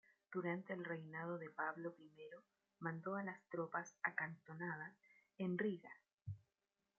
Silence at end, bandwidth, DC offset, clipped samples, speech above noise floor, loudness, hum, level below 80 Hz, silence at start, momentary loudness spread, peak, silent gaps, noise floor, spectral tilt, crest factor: 0.6 s; 7.2 kHz; under 0.1%; under 0.1%; over 43 dB; -47 LUFS; none; -88 dBFS; 0.3 s; 15 LU; -24 dBFS; 6.13-6.18 s; under -90 dBFS; -6 dB/octave; 24 dB